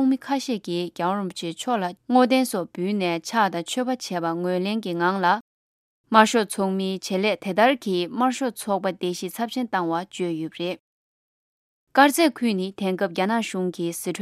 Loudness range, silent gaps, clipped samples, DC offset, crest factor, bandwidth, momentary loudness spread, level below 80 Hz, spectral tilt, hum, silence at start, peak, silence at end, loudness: 4 LU; 5.41-6.04 s, 10.80-11.87 s; under 0.1%; under 0.1%; 22 dB; 15.5 kHz; 10 LU; -74 dBFS; -4.5 dB/octave; none; 0 s; 0 dBFS; 0 s; -23 LUFS